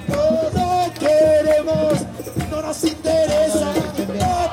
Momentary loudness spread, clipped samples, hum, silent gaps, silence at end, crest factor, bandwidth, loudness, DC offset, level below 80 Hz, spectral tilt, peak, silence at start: 10 LU; under 0.1%; none; none; 0 s; 14 dB; 16.5 kHz; -18 LUFS; under 0.1%; -42 dBFS; -5.5 dB/octave; -4 dBFS; 0 s